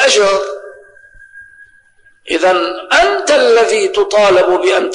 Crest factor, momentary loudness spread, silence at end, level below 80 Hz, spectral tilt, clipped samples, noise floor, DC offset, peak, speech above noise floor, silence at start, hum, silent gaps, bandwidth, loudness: 12 dB; 8 LU; 0 s; -48 dBFS; -1.5 dB/octave; under 0.1%; -49 dBFS; under 0.1%; -2 dBFS; 38 dB; 0 s; none; none; 10.5 kHz; -11 LUFS